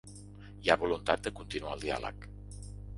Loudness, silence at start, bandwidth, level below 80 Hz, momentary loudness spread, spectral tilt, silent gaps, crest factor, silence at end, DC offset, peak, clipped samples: -33 LUFS; 0.05 s; 11.5 kHz; -50 dBFS; 21 LU; -4.5 dB/octave; none; 28 dB; 0 s; under 0.1%; -8 dBFS; under 0.1%